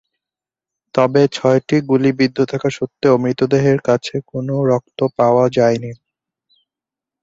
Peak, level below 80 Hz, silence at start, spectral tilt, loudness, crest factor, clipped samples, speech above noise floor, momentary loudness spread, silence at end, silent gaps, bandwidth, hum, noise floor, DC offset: -2 dBFS; -56 dBFS; 0.95 s; -7 dB/octave; -16 LUFS; 16 dB; under 0.1%; 73 dB; 8 LU; 1.25 s; none; 7.8 kHz; none; -88 dBFS; under 0.1%